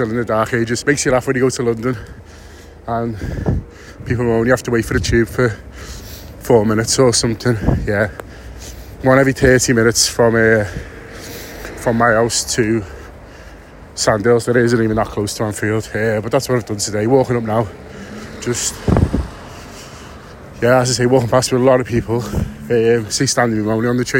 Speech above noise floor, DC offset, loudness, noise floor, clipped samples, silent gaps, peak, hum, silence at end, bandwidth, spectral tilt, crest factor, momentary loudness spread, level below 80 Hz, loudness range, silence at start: 22 dB; under 0.1%; -16 LUFS; -38 dBFS; under 0.1%; none; 0 dBFS; none; 0 s; 16.5 kHz; -4.5 dB/octave; 16 dB; 20 LU; -32 dBFS; 5 LU; 0 s